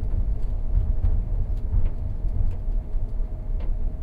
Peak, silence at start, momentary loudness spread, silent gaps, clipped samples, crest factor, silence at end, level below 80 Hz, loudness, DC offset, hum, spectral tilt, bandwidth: -10 dBFS; 0 s; 6 LU; none; under 0.1%; 12 dB; 0 s; -24 dBFS; -30 LUFS; under 0.1%; none; -10 dB/octave; 2.2 kHz